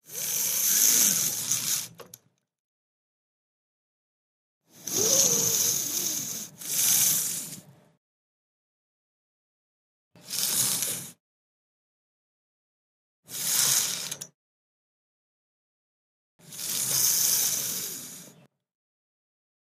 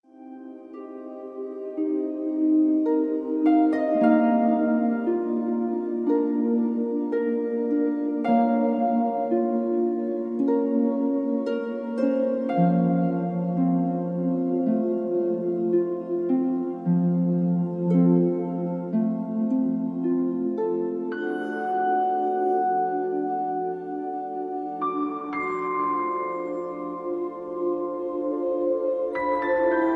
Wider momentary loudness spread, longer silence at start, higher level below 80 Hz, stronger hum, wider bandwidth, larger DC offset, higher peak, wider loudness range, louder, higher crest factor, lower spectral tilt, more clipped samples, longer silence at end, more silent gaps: first, 19 LU vs 9 LU; about the same, 0.1 s vs 0.2 s; second, -76 dBFS vs -70 dBFS; neither; first, 15.5 kHz vs 4.5 kHz; neither; first, -4 dBFS vs -8 dBFS; first, 9 LU vs 6 LU; about the same, -23 LUFS vs -25 LUFS; first, 26 dB vs 16 dB; second, 0 dB/octave vs -10.5 dB/octave; neither; first, 1.5 s vs 0 s; first, 2.59-4.61 s, 7.97-10.11 s, 11.20-13.23 s, 14.34-16.39 s vs none